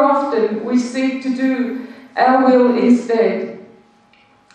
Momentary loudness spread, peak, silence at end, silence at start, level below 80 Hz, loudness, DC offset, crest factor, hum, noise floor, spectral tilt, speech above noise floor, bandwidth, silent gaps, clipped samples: 12 LU; -2 dBFS; 0.9 s; 0 s; -68 dBFS; -16 LUFS; under 0.1%; 14 dB; none; -52 dBFS; -6 dB/octave; 37 dB; 9 kHz; none; under 0.1%